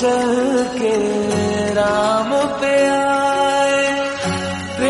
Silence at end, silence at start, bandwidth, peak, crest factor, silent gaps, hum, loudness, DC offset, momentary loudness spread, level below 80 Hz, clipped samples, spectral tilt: 0 s; 0 s; 11.5 kHz; -4 dBFS; 14 dB; none; none; -17 LUFS; under 0.1%; 5 LU; -50 dBFS; under 0.1%; -4.5 dB/octave